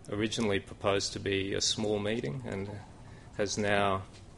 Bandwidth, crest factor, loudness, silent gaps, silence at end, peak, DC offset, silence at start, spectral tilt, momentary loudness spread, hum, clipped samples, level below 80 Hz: 11.5 kHz; 20 dB; -31 LUFS; none; 0 s; -12 dBFS; under 0.1%; 0 s; -4 dB/octave; 14 LU; none; under 0.1%; -56 dBFS